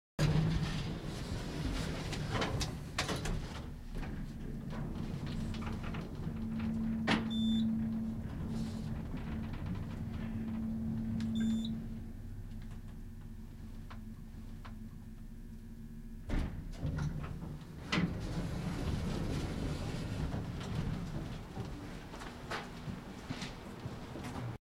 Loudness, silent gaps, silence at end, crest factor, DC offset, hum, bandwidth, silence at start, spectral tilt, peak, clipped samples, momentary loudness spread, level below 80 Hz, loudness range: -39 LUFS; none; 0.15 s; 22 dB; under 0.1%; none; 16 kHz; 0.2 s; -6 dB/octave; -16 dBFS; under 0.1%; 15 LU; -46 dBFS; 10 LU